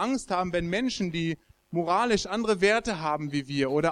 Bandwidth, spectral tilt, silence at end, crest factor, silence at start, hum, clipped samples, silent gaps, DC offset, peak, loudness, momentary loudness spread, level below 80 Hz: 11 kHz; -5 dB/octave; 0 s; 18 dB; 0 s; none; under 0.1%; none; under 0.1%; -10 dBFS; -27 LUFS; 8 LU; -52 dBFS